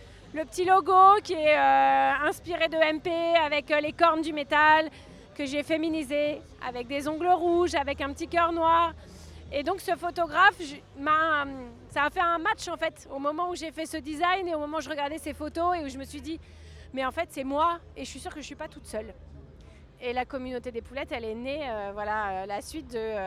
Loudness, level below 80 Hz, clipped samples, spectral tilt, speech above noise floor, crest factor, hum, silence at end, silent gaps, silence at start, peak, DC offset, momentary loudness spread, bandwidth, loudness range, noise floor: -26 LUFS; -52 dBFS; under 0.1%; -4 dB/octave; 23 dB; 20 dB; none; 0 s; none; 0 s; -8 dBFS; under 0.1%; 17 LU; 15 kHz; 11 LU; -50 dBFS